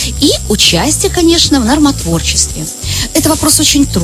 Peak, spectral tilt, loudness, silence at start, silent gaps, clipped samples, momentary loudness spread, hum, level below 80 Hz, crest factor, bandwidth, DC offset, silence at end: 0 dBFS; -3 dB/octave; -9 LUFS; 0 s; none; 0.3%; 6 LU; none; -24 dBFS; 10 dB; over 20 kHz; under 0.1%; 0 s